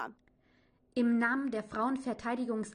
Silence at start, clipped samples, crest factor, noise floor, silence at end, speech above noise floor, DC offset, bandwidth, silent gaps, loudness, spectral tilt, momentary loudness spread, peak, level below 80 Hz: 0 s; under 0.1%; 16 dB; -69 dBFS; 0 s; 37 dB; under 0.1%; 10 kHz; none; -33 LUFS; -5.5 dB/octave; 8 LU; -18 dBFS; -70 dBFS